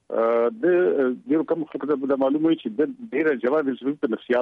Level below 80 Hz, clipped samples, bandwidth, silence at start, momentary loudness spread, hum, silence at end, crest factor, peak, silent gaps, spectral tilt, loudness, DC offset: -72 dBFS; under 0.1%; 4.7 kHz; 0.1 s; 6 LU; none; 0 s; 12 dB; -10 dBFS; none; -8.5 dB/octave; -23 LUFS; under 0.1%